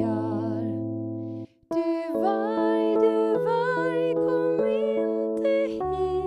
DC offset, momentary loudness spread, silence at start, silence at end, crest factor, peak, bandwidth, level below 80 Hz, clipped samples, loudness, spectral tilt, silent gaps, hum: under 0.1%; 9 LU; 0 s; 0 s; 14 dB; -10 dBFS; 9.8 kHz; -56 dBFS; under 0.1%; -25 LUFS; -8 dB/octave; none; none